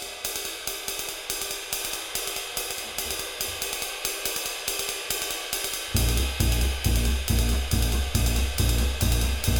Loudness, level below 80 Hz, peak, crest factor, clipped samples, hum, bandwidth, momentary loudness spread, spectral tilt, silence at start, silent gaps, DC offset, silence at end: -27 LUFS; -30 dBFS; -8 dBFS; 18 dB; under 0.1%; none; 19 kHz; 5 LU; -3 dB/octave; 0 s; none; under 0.1%; 0 s